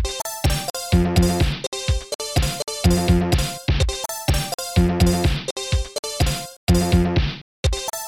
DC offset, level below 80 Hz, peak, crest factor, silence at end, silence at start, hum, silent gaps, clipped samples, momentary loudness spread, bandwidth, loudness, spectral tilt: 0.2%; -26 dBFS; -6 dBFS; 14 dB; 0 s; 0 s; none; 0.70-0.74 s, 1.67-1.72 s, 2.15-2.19 s, 4.54-4.58 s, 5.51-5.56 s, 5.99-6.03 s, 6.57-6.67 s, 7.41-7.63 s; under 0.1%; 7 LU; 19 kHz; -21 LUFS; -5 dB/octave